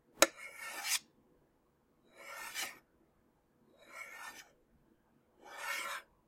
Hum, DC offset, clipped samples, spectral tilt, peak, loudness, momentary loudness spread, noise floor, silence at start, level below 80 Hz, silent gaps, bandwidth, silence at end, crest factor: none; under 0.1%; under 0.1%; 0.5 dB/octave; -6 dBFS; -38 LUFS; 23 LU; -74 dBFS; 0.15 s; -80 dBFS; none; 16.5 kHz; 0.25 s; 36 dB